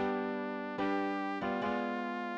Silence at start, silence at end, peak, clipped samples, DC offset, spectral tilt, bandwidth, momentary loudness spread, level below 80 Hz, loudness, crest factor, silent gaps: 0 s; 0 s; -22 dBFS; under 0.1%; under 0.1%; -7 dB/octave; 8 kHz; 3 LU; -68 dBFS; -35 LUFS; 14 dB; none